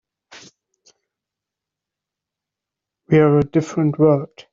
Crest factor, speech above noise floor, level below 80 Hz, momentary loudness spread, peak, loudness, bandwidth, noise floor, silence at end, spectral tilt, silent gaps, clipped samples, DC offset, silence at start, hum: 18 dB; 69 dB; -54 dBFS; 7 LU; -2 dBFS; -17 LUFS; 7.6 kHz; -85 dBFS; 0.25 s; -8.5 dB/octave; none; under 0.1%; under 0.1%; 0.35 s; none